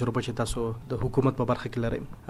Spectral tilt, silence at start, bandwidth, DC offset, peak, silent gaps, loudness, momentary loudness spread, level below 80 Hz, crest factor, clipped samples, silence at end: -6.5 dB/octave; 0 s; 13.5 kHz; under 0.1%; -10 dBFS; none; -29 LUFS; 6 LU; -42 dBFS; 18 dB; under 0.1%; 0 s